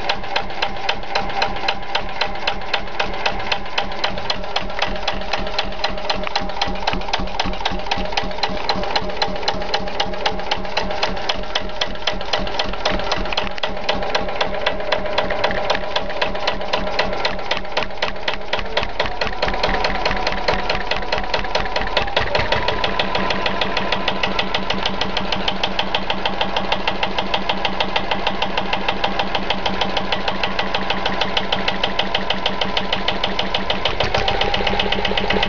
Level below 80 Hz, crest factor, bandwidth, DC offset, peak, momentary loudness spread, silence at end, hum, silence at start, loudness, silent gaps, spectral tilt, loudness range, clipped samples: -34 dBFS; 20 dB; 7.4 kHz; 8%; -4 dBFS; 4 LU; 0 s; none; 0 s; -21 LUFS; none; -1 dB/octave; 3 LU; under 0.1%